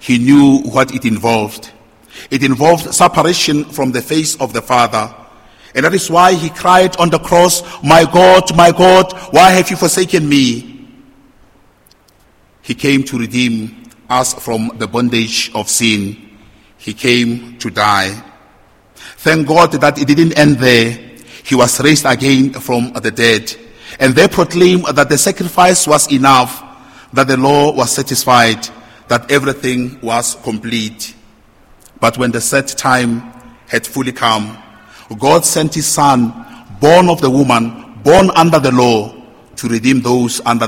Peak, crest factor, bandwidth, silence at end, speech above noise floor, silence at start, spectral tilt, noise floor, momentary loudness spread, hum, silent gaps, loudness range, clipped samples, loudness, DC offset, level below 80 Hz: 0 dBFS; 12 dB; 17 kHz; 0 s; 38 dB; 0.05 s; -4 dB/octave; -49 dBFS; 12 LU; none; none; 8 LU; 0.9%; -11 LUFS; under 0.1%; -42 dBFS